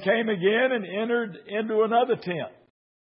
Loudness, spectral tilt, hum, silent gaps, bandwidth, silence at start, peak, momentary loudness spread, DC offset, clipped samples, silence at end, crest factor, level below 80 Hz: -25 LUFS; -10 dB/octave; none; none; 5.6 kHz; 0 s; -10 dBFS; 10 LU; under 0.1%; under 0.1%; 0.55 s; 16 dB; -78 dBFS